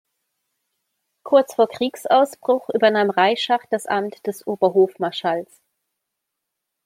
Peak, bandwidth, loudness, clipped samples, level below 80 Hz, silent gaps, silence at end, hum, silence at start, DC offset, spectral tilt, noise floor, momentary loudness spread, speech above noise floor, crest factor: -2 dBFS; 16 kHz; -20 LUFS; under 0.1%; -74 dBFS; none; 1.4 s; none; 1.25 s; under 0.1%; -4.5 dB/octave; -81 dBFS; 8 LU; 61 dB; 18 dB